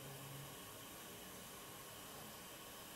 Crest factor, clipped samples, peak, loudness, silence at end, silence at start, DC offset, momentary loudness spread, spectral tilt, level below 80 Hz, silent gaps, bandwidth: 14 dB; under 0.1%; -40 dBFS; -52 LUFS; 0 s; 0 s; under 0.1%; 1 LU; -2.5 dB/octave; -74 dBFS; none; 16 kHz